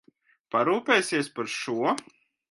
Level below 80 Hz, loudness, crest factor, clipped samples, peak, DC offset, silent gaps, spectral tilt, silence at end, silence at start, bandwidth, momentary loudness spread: -78 dBFS; -26 LUFS; 22 dB; under 0.1%; -6 dBFS; under 0.1%; none; -3.5 dB/octave; 0.5 s; 0.55 s; 11.5 kHz; 8 LU